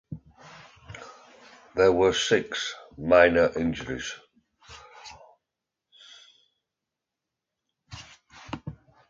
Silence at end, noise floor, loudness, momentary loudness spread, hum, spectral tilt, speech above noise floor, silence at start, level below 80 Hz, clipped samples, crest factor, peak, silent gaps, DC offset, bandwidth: 0.35 s; -87 dBFS; -24 LUFS; 26 LU; none; -4 dB/octave; 64 dB; 0.1 s; -54 dBFS; under 0.1%; 24 dB; -4 dBFS; none; under 0.1%; 8.8 kHz